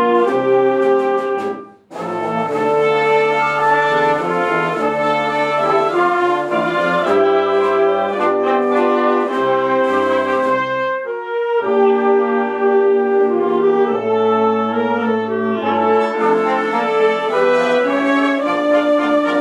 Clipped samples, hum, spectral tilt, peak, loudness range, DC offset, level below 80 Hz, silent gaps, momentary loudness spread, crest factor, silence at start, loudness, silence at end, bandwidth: under 0.1%; none; -6 dB/octave; -2 dBFS; 1 LU; under 0.1%; -64 dBFS; none; 5 LU; 12 dB; 0 s; -16 LUFS; 0 s; 10 kHz